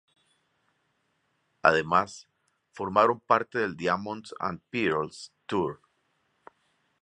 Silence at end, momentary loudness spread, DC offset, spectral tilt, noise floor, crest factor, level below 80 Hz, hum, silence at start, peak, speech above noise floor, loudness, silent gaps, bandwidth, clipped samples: 1.25 s; 14 LU; under 0.1%; -5.5 dB/octave; -74 dBFS; 26 dB; -64 dBFS; none; 1.65 s; -4 dBFS; 46 dB; -27 LUFS; none; 10.5 kHz; under 0.1%